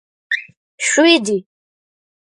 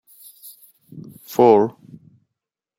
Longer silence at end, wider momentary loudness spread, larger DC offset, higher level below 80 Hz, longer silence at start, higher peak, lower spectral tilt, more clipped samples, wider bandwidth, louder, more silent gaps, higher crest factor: second, 0.95 s vs 1.1 s; second, 11 LU vs 27 LU; neither; about the same, -72 dBFS vs -68 dBFS; second, 0.3 s vs 0.95 s; about the same, -2 dBFS vs -2 dBFS; second, -2 dB/octave vs -7 dB/octave; neither; second, 11.5 kHz vs 16.5 kHz; about the same, -16 LUFS vs -17 LUFS; first, 0.57-0.78 s vs none; about the same, 18 dB vs 20 dB